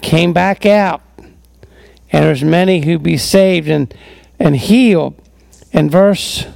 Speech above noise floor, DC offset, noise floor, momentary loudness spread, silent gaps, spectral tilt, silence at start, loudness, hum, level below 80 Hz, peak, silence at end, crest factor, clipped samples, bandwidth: 33 dB; under 0.1%; -44 dBFS; 7 LU; none; -6 dB/octave; 0 s; -12 LUFS; none; -40 dBFS; 0 dBFS; 0.05 s; 12 dB; under 0.1%; 16.5 kHz